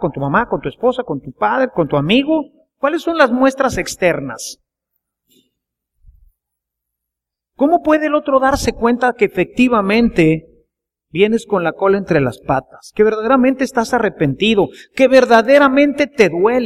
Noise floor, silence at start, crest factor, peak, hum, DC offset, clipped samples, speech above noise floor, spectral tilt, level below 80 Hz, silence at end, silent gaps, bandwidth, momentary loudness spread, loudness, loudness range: -82 dBFS; 0 s; 16 dB; 0 dBFS; none; under 0.1%; under 0.1%; 68 dB; -5.5 dB/octave; -42 dBFS; 0 s; none; 14.5 kHz; 9 LU; -15 LUFS; 8 LU